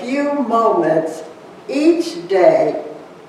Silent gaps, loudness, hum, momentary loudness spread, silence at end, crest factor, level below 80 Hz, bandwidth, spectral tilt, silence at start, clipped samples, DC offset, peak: none; -16 LUFS; none; 20 LU; 0 s; 16 dB; -68 dBFS; 12.5 kHz; -6 dB/octave; 0 s; under 0.1%; under 0.1%; -2 dBFS